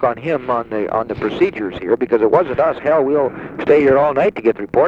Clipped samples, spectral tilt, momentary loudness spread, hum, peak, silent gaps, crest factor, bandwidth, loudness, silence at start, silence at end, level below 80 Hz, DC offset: under 0.1%; -8 dB/octave; 8 LU; none; -2 dBFS; none; 14 dB; 6.8 kHz; -16 LUFS; 0 s; 0 s; -48 dBFS; under 0.1%